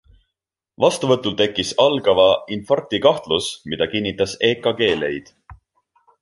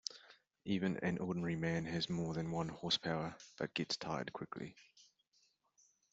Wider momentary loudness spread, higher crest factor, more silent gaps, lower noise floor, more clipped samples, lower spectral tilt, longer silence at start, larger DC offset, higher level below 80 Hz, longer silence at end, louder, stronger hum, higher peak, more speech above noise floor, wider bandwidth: second, 7 LU vs 11 LU; second, 18 dB vs 24 dB; neither; first, -81 dBFS vs -77 dBFS; neither; about the same, -4 dB/octave vs -4 dB/octave; first, 0.8 s vs 0.1 s; neither; first, -52 dBFS vs -70 dBFS; second, 0.7 s vs 1.1 s; first, -19 LUFS vs -40 LUFS; neither; first, -2 dBFS vs -18 dBFS; first, 63 dB vs 37 dB; first, 11.5 kHz vs 8 kHz